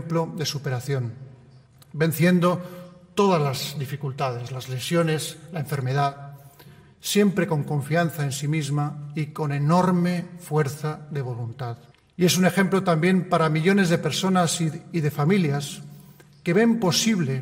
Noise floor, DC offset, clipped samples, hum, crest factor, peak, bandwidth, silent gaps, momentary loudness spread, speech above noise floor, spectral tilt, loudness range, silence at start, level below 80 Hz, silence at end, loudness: -51 dBFS; under 0.1%; under 0.1%; none; 18 dB; -6 dBFS; 16 kHz; none; 13 LU; 28 dB; -5.5 dB/octave; 4 LU; 0 s; -64 dBFS; 0 s; -23 LUFS